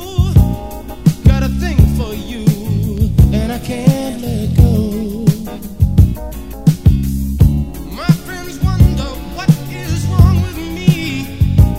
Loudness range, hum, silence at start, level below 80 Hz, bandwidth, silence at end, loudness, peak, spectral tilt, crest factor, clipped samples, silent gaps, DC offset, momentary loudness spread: 1 LU; none; 0 s; -20 dBFS; 16.5 kHz; 0 s; -15 LUFS; 0 dBFS; -7.5 dB/octave; 14 dB; 0.4%; none; 1%; 9 LU